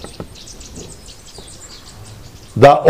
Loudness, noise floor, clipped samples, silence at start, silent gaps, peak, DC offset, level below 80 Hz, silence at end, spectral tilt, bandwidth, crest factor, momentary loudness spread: -12 LUFS; -37 dBFS; 1%; 0.2 s; none; 0 dBFS; 0.5%; -42 dBFS; 0 s; -5.5 dB/octave; 15.5 kHz; 16 dB; 23 LU